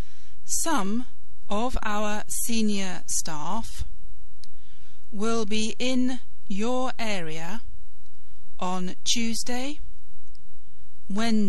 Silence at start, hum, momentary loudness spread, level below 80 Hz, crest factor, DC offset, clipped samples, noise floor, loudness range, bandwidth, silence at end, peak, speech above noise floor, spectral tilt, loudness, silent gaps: 0.05 s; none; 13 LU; -46 dBFS; 18 dB; 10%; under 0.1%; -50 dBFS; 3 LU; 12.5 kHz; 0 s; -8 dBFS; 22 dB; -3.5 dB/octave; -29 LUFS; none